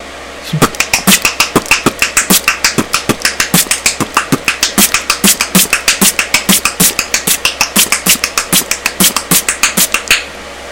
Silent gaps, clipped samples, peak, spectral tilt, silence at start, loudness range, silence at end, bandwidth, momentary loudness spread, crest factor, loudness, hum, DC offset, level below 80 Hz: none; 1%; 0 dBFS; -1.5 dB/octave; 0 s; 1 LU; 0 s; over 20 kHz; 6 LU; 12 dB; -9 LUFS; none; 0.5%; -38 dBFS